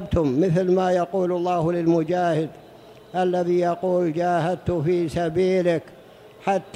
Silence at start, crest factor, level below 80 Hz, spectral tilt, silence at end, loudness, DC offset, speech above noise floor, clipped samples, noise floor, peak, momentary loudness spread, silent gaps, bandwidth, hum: 0 s; 14 dB; -46 dBFS; -7.5 dB/octave; 0.05 s; -22 LUFS; under 0.1%; 25 dB; under 0.1%; -46 dBFS; -8 dBFS; 5 LU; none; 11 kHz; none